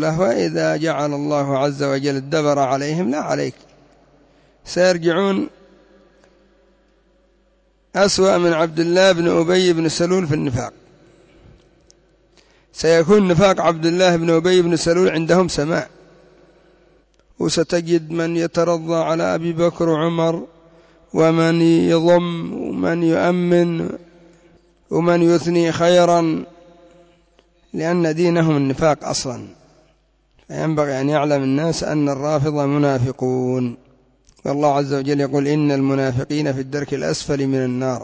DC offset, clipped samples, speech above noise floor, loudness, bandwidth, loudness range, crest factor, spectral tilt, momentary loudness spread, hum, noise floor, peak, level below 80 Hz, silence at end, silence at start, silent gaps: under 0.1%; under 0.1%; 42 dB; -18 LUFS; 8 kHz; 5 LU; 14 dB; -6 dB/octave; 10 LU; none; -59 dBFS; -4 dBFS; -50 dBFS; 0 s; 0 s; none